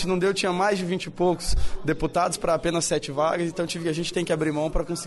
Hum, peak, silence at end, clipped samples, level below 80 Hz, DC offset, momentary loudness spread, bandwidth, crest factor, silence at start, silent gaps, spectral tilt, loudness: none; -12 dBFS; 0 s; under 0.1%; -34 dBFS; under 0.1%; 5 LU; 11.5 kHz; 12 dB; 0 s; none; -4.5 dB/octave; -25 LUFS